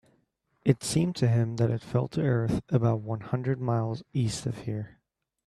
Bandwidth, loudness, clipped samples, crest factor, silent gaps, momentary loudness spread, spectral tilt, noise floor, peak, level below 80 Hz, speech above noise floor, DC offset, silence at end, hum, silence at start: 12.5 kHz; -28 LUFS; under 0.1%; 20 dB; none; 8 LU; -6.5 dB/octave; -72 dBFS; -8 dBFS; -56 dBFS; 45 dB; under 0.1%; 0.6 s; none; 0.65 s